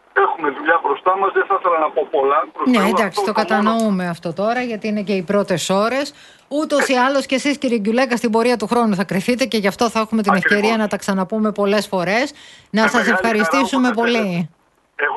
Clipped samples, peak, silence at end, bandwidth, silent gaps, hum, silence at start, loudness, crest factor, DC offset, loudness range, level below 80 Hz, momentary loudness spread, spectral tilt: under 0.1%; 0 dBFS; 0 s; 12.5 kHz; none; none; 0.15 s; -17 LUFS; 16 dB; under 0.1%; 2 LU; -58 dBFS; 7 LU; -5 dB/octave